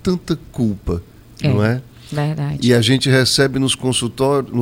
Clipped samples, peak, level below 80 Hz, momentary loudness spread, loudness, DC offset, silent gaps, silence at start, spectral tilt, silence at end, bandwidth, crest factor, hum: under 0.1%; 0 dBFS; -40 dBFS; 11 LU; -17 LUFS; under 0.1%; none; 0.05 s; -5 dB/octave; 0 s; 16.5 kHz; 18 dB; none